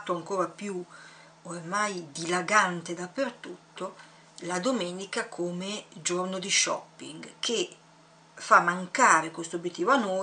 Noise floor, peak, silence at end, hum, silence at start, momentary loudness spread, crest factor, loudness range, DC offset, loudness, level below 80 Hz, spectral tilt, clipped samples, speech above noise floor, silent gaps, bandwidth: -57 dBFS; -6 dBFS; 0 s; none; 0 s; 20 LU; 24 dB; 7 LU; under 0.1%; -27 LUFS; -80 dBFS; -2.5 dB/octave; under 0.1%; 28 dB; none; 10 kHz